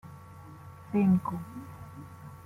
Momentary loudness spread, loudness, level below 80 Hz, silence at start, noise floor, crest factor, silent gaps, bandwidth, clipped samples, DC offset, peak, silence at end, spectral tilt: 23 LU; -29 LUFS; -64 dBFS; 0.05 s; -48 dBFS; 18 dB; none; 13 kHz; under 0.1%; under 0.1%; -16 dBFS; 0.05 s; -9.5 dB/octave